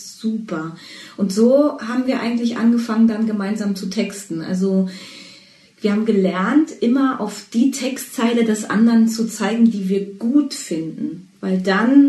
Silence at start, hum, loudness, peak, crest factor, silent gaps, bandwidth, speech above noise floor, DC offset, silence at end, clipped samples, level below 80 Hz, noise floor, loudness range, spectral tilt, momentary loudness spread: 0 s; none; -19 LUFS; -2 dBFS; 16 dB; none; 12.5 kHz; 30 dB; under 0.1%; 0 s; under 0.1%; -68 dBFS; -47 dBFS; 3 LU; -6 dB/octave; 12 LU